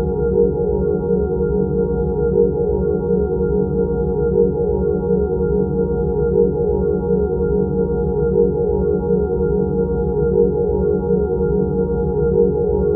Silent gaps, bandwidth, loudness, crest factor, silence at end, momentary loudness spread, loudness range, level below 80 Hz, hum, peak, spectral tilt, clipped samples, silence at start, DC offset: none; 1.5 kHz; -18 LUFS; 14 dB; 0 s; 3 LU; 1 LU; -28 dBFS; none; -4 dBFS; -14.5 dB/octave; under 0.1%; 0 s; under 0.1%